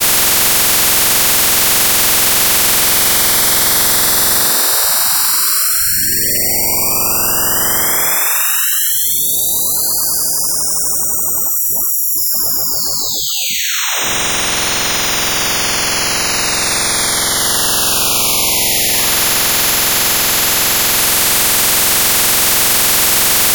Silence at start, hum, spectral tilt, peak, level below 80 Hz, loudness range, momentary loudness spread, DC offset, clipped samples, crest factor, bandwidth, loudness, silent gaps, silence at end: 0 s; none; 0 dB/octave; 0 dBFS; -38 dBFS; 4 LU; 4 LU; 0.5%; under 0.1%; 14 dB; 19.5 kHz; -10 LUFS; none; 0 s